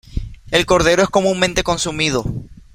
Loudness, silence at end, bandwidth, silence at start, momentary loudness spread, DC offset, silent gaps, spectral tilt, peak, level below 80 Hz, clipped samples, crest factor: -16 LUFS; 0.15 s; 16 kHz; 0.1 s; 16 LU; under 0.1%; none; -4 dB/octave; 0 dBFS; -32 dBFS; under 0.1%; 18 dB